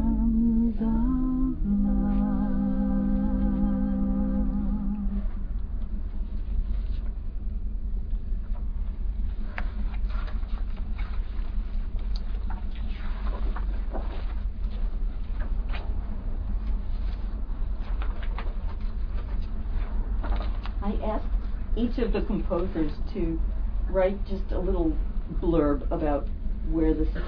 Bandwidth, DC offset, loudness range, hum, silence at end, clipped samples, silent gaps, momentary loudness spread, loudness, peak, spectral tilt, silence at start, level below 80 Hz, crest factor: 5 kHz; under 0.1%; 8 LU; none; 0 s; under 0.1%; none; 10 LU; -30 LUFS; -12 dBFS; -11 dB/octave; 0 s; -28 dBFS; 14 dB